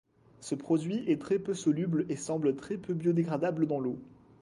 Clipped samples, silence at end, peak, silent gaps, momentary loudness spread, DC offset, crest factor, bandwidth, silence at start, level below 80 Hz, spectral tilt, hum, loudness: under 0.1%; 0.25 s; -16 dBFS; none; 8 LU; under 0.1%; 16 dB; 11.5 kHz; 0.4 s; -70 dBFS; -7 dB/octave; none; -31 LUFS